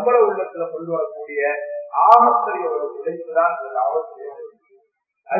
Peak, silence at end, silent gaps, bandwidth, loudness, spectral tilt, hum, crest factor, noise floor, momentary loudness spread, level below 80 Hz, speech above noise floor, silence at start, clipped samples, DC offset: 0 dBFS; 0 s; none; 5.8 kHz; -19 LUFS; -7 dB/octave; none; 20 dB; -63 dBFS; 16 LU; -78 dBFS; 44 dB; 0 s; under 0.1%; under 0.1%